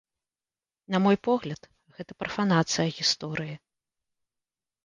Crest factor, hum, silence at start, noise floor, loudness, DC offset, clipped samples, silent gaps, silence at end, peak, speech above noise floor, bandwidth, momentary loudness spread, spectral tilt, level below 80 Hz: 20 dB; none; 0.9 s; under -90 dBFS; -26 LUFS; under 0.1%; under 0.1%; none; 1.3 s; -10 dBFS; over 63 dB; 10 kHz; 19 LU; -4.5 dB/octave; -66 dBFS